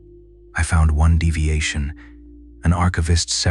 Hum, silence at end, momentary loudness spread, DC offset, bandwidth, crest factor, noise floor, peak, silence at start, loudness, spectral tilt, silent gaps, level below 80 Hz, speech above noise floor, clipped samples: none; 0 s; 11 LU; under 0.1%; 11 kHz; 14 dB; -45 dBFS; -6 dBFS; 0.55 s; -19 LUFS; -4.5 dB/octave; none; -26 dBFS; 27 dB; under 0.1%